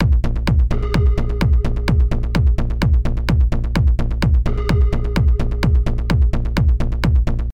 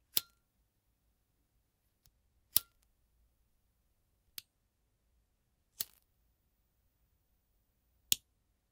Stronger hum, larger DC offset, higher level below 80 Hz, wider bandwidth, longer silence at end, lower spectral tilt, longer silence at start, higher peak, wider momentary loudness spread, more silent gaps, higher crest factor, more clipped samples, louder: neither; neither; first, -16 dBFS vs -78 dBFS; second, 8.8 kHz vs 16 kHz; second, 0 s vs 0.55 s; first, -7.5 dB/octave vs 1 dB/octave; second, 0 s vs 0.15 s; about the same, -4 dBFS vs -2 dBFS; second, 1 LU vs 18 LU; neither; second, 12 dB vs 44 dB; neither; first, -18 LUFS vs -35 LUFS